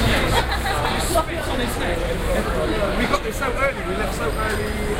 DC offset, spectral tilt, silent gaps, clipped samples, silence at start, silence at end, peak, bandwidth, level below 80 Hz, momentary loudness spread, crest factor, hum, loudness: under 0.1%; -4.5 dB/octave; none; under 0.1%; 0 s; 0 s; -4 dBFS; 16 kHz; -28 dBFS; 4 LU; 18 dB; none; -22 LUFS